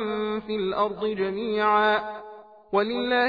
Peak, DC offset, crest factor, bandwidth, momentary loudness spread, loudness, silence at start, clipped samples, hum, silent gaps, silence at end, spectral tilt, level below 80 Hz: -10 dBFS; under 0.1%; 16 dB; 5 kHz; 10 LU; -25 LUFS; 0 s; under 0.1%; none; none; 0 s; -7 dB/octave; -60 dBFS